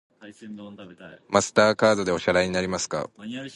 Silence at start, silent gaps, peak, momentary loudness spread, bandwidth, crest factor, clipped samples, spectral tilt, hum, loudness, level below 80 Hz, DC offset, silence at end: 0.2 s; none; -2 dBFS; 22 LU; 11.5 kHz; 22 dB; under 0.1%; -4 dB/octave; none; -23 LUFS; -54 dBFS; under 0.1%; 0.05 s